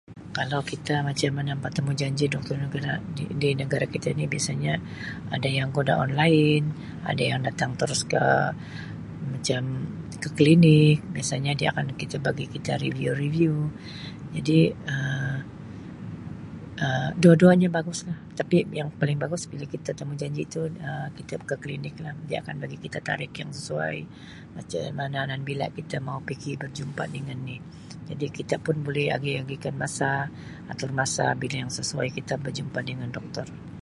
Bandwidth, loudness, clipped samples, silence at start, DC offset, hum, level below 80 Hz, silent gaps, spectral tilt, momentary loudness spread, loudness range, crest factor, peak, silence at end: 11.5 kHz; -26 LUFS; under 0.1%; 0.1 s; under 0.1%; none; -54 dBFS; none; -5.5 dB/octave; 15 LU; 10 LU; 22 dB; -4 dBFS; 0.05 s